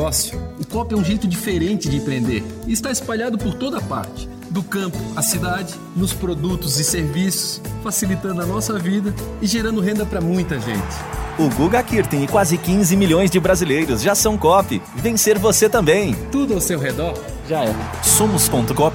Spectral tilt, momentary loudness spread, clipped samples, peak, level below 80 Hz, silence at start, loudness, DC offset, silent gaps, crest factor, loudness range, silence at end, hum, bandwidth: -4.5 dB/octave; 10 LU; under 0.1%; -2 dBFS; -34 dBFS; 0 s; -19 LUFS; under 0.1%; none; 18 dB; 7 LU; 0 s; none; 17 kHz